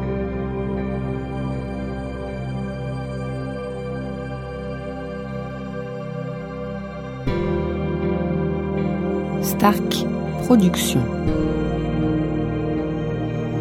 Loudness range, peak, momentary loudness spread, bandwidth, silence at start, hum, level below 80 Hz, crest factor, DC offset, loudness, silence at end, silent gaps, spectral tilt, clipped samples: 9 LU; -2 dBFS; 12 LU; 16.5 kHz; 0 s; none; -36 dBFS; 20 dB; under 0.1%; -24 LUFS; 0 s; none; -6.5 dB/octave; under 0.1%